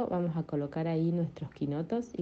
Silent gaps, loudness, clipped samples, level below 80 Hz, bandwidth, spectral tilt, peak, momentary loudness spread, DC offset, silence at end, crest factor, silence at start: none; -33 LUFS; under 0.1%; -62 dBFS; 7.2 kHz; -9.5 dB/octave; -20 dBFS; 6 LU; under 0.1%; 0 s; 12 dB; 0 s